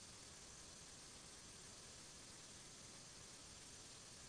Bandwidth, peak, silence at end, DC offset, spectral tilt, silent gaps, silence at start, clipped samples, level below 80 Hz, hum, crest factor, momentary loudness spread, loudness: 11 kHz; -46 dBFS; 0 s; under 0.1%; -1.5 dB/octave; none; 0 s; under 0.1%; -74 dBFS; none; 12 dB; 0 LU; -57 LUFS